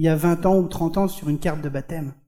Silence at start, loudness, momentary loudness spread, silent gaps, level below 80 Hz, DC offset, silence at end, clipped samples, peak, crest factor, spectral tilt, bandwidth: 0 s; -22 LUFS; 10 LU; none; -40 dBFS; under 0.1%; 0.15 s; under 0.1%; -8 dBFS; 14 dB; -7.5 dB/octave; 17 kHz